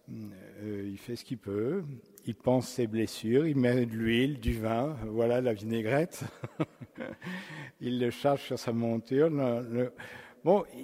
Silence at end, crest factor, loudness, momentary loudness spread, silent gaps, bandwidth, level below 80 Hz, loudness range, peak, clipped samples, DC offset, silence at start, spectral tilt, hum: 0 s; 20 dB; -31 LUFS; 15 LU; none; 16 kHz; -52 dBFS; 4 LU; -12 dBFS; under 0.1%; under 0.1%; 0.1 s; -6.5 dB/octave; none